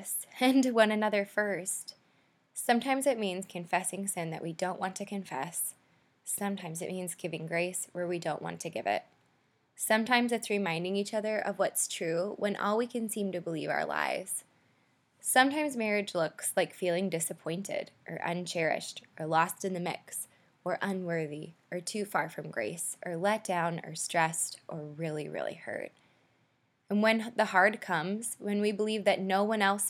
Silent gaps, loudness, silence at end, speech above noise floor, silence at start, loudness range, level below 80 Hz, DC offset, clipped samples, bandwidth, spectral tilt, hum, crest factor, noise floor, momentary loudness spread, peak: none; -32 LUFS; 0 s; 41 dB; 0 s; 5 LU; -86 dBFS; under 0.1%; under 0.1%; 18 kHz; -3.5 dB/octave; none; 24 dB; -72 dBFS; 11 LU; -8 dBFS